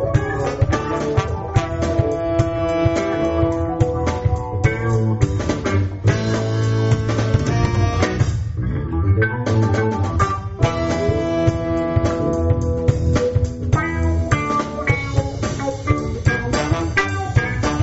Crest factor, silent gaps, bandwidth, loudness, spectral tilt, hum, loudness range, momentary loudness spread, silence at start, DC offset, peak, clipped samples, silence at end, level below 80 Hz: 16 dB; none; 8 kHz; -20 LUFS; -6.5 dB/octave; none; 1 LU; 3 LU; 0 s; under 0.1%; -4 dBFS; under 0.1%; 0 s; -30 dBFS